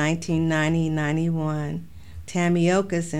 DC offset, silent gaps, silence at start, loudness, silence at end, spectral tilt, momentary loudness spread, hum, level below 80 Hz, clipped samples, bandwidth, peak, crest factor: 0.8%; none; 0 s; -23 LUFS; 0 s; -6 dB/octave; 12 LU; none; -48 dBFS; under 0.1%; 11.5 kHz; -10 dBFS; 12 dB